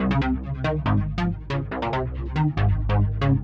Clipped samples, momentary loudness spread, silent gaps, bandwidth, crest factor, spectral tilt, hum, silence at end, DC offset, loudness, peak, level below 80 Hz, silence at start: under 0.1%; 6 LU; none; 6.6 kHz; 14 dB; -9 dB/octave; none; 0 s; under 0.1%; -25 LUFS; -10 dBFS; -30 dBFS; 0 s